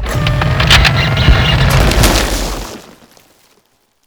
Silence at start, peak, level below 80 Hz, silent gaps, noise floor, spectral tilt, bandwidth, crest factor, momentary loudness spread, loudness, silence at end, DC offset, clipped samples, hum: 0 s; 0 dBFS; -18 dBFS; none; -56 dBFS; -4 dB/octave; over 20 kHz; 12 dB; 12 LU; -11 LUFS; 1.25 s; under 0.1%; 0.2%; none